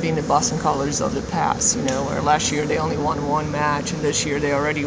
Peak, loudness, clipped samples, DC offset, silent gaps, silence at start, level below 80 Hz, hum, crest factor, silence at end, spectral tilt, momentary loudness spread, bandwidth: -4 dBFS; -21 LUFS; under 0.1%; under 0.1%; none; 0 s; -40 dBFS; none; 18 dB; 0 s; -4 dB/octave; 4 LU; 8 kHz